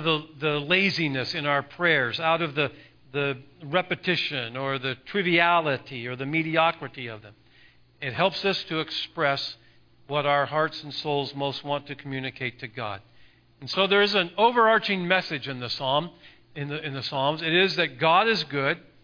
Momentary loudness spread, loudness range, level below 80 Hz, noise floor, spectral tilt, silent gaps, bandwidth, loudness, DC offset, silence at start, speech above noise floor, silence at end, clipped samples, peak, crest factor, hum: 14 LU; 5 LU; -66 dBFS; -56 dBFS; -5.5 dB/octave; none; 5.4 kHz; -25 LUFS; under 0.1%; 0 s; 30 dB; 0.25 s; under 0.1%; -4 dBFS; 22 dB; none